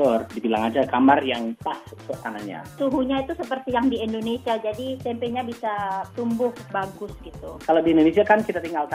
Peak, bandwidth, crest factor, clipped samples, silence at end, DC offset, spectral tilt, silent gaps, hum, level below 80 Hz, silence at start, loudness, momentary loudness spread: -2 dBFS; 15.5 kHz; 20 dB; under 0.1%; 0 s; under 0.1%; -6 dB/octave; none; none; -52 dBFS; 0 s; -23 LUFS; 15 LU